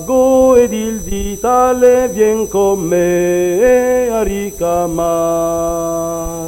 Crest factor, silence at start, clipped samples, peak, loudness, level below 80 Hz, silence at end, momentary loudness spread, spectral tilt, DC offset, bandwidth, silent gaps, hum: 12 dB; 0 s; under 0.1%; 0 dBFS; -13 LUFS; -32 dBFS; 0 s; 9 LU; -5 dB/octave; under 0.1%; 16.5 kHz; none; none